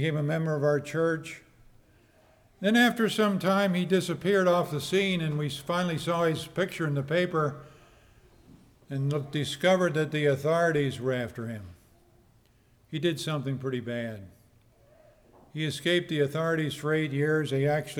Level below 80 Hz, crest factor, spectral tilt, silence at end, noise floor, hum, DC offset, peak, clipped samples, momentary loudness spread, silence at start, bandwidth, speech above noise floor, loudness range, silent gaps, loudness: -64 dBFS; 18 dB; -6 dB/octave; 0 s; -62 dBFS; none; under 0.1%; -10 dBFS; under 0.1%; 10 LU; 0 s; 18.5 kHz; 35 dB; 8 LU; none; -28 LUFS